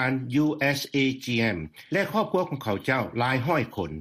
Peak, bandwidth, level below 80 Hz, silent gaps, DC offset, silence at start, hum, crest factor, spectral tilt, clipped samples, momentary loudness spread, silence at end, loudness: -10 dBFS; 15.5 kHz; -56 dBFS; none; under 0.1%; 0 s; none; 16 dB; -6 dB/octave; under 0.1%; 5 LU; 0 s; -26 LUFS